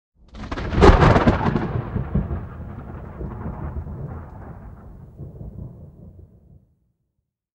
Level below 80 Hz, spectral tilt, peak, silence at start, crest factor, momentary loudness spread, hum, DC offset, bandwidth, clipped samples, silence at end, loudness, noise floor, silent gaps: -28 dBFS; -7.5 dB/octave; 0 dBFS; 0.35 s; 22 dB; 25 LU; none; under 0.1%; 9 kHz; under 0.1%; 1.35 s; -20 LUFS; -77 dBFS; none